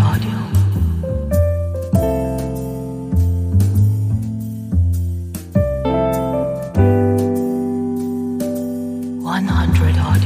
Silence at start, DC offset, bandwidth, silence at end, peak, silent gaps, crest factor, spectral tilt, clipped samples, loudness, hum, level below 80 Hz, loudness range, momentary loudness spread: 0 s; under 0.1%; 15.5 kHz; 0 s; -2 dBFS; none; 16 dB; -8 dB/octave; under 0.1%; -18 LUFS; none; -28 dBFS; 1 LU; 9 LU